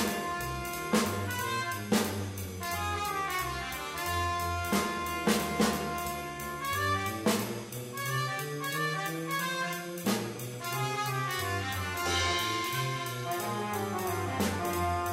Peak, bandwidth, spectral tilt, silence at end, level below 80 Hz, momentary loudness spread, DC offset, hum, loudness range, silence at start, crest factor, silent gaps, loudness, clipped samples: -12 dBFS; 16 kHz; -4 dB/octave; 0 s; -54 dBFS; 6 LU; under 0.1%; none; 2 LU; 0 s; 20 dB; none; -32 LUFS; under 0.1%